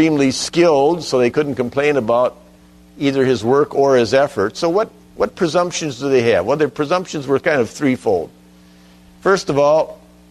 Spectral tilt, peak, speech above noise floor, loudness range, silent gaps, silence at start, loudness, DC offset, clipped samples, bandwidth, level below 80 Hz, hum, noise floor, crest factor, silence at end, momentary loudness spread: -5 dB/octave; -2 dBFS; 30 dB; 2 LU; none; 0 s; -17 LUFS; under 0.1%; under 0.1%; 13.5 kHz; -52 dBFS; none; -46 dBFS; 14 dB; 0.35 s; 7 LU